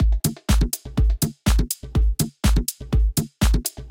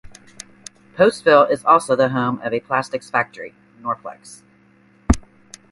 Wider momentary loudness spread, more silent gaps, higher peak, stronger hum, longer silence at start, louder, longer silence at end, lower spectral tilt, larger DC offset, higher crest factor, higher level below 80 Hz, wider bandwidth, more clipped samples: second, 3 LU vs 23 LU; neither; second, -6 dBFS vs 0 dBFS; neither; second, 0 s vs 0.95 s; second, -23 LUFS vs -18 LUFS; second, 0 s vs 0.5 s; about the same, -5 dB/octave vs -5.5 dB/octave; neither; second, 14 dB vs 20 dB; first, -22 dBFS vs -36 dBFS; first, 17 kHz vs 11.5 kHz; neither